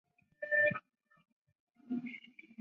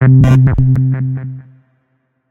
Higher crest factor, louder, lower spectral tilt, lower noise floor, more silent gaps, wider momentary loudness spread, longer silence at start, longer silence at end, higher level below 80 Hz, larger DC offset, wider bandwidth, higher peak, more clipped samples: first, 18 dB vs 12 dB; second, -34 LUFS vs -11 LUFS; second, -4 dB/octave vs -9.5 dB/octave; second, -53 dBFS vs -63 dBFS; first, 1.32-1.42 s, 1.60-1.67 s vs none; about the same, 20 LU vs 19 LU; first, 0.4 s vs 0 s; second, 0.45 s vs 0.9 s; second, -80 dBFS vs -28 dBFS; neither; first, 5.6 kHz vs 3.6 kHz; second, -20 dBFS vs 0 dBFS; neither